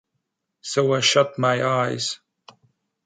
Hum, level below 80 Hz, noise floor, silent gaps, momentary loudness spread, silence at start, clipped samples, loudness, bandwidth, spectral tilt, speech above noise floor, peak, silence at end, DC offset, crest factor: none; -70 dBFS; -78 dBFS; none; 12 LU; 0.65 s; under 0.1%; -21 LUFS; 9.4 kHz; -3.5 dB/octave; 57 dB; -2 dBFS; 0.9 s; under 0.1%; 20 dB